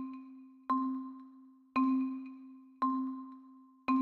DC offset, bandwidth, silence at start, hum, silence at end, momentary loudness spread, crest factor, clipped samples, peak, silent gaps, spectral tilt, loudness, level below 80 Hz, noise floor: under 0.1%; 4.5 kHz; 0 s; none; 0 s; 21 LU; 16 dB; under 0.1%; -20 dBFS; none; -6.5 dB/octave; -36 LUFS; -82 dBFS; -58 dBFS